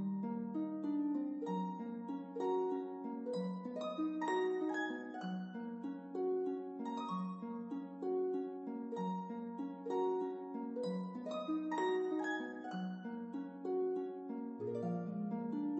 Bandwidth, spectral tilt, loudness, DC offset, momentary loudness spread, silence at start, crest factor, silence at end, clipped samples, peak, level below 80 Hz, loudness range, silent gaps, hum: 8.2 kHz; -7.5 dB/octave; -41 LUFS; under 0.1%; 8 LU; 0 s; 14 dB; 0 s; under 0.1%; -26 dBFS; under -90 dBFS; 2 LU; none; none